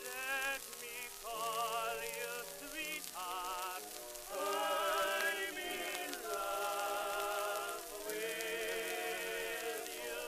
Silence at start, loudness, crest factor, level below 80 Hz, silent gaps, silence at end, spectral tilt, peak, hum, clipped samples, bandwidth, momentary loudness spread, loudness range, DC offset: 0 s; -39 LUFS; 22 dB; -68 dBFS; none; 0 s; -0.5 dB/octave; -18 dBFS; none; under 0.1%; 15.5 kHz; 8 LU; 3 LU; under 0.1%